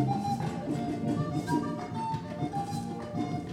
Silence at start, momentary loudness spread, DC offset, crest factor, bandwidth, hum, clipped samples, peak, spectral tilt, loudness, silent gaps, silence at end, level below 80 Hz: 0 s; 4 LU; under 0.1%; 16 dB; 15.5 kHz; none; under 0.1%; -16 dBFS; -7 dB/octave; -33 LUFS; none; 0 s; -58 dBFS